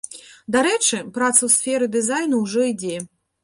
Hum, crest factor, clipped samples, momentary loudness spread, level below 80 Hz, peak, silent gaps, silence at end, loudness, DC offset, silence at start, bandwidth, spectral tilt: none; 20 dB; under 0.1%; 16 LU; -64 dBFS; -2 dBFS; none; 0.4 s; -19 LUFS; under 0.1%; 0.1 s; 12 kHz; -2 dB/octave